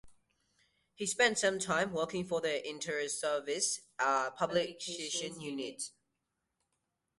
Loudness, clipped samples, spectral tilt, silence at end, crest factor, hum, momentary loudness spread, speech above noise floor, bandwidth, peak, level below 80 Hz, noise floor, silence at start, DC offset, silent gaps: -34 LUFS; under 0.1%; -2 dB/octave; 1.3 s; 22 dB; none; 11 LU; 50 dB; 11.5 kHz; -14 dBFS; -74 dBFS; -85 dBFS; 0.05 s; under 0.1%; none